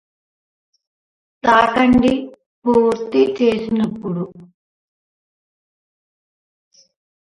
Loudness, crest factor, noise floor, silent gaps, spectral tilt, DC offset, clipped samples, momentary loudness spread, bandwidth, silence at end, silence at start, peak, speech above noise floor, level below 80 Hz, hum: -17 LUFS; 20 dB; under -90 dBFS; 2.46-2.62 s; -6.5 dB/octave; under 0.1%; under 0.1%; 12 LU; 10.5 kHz; 2.95 s; 1.45 s; 0 dBFS; over 74 dB; -48 dBFS; none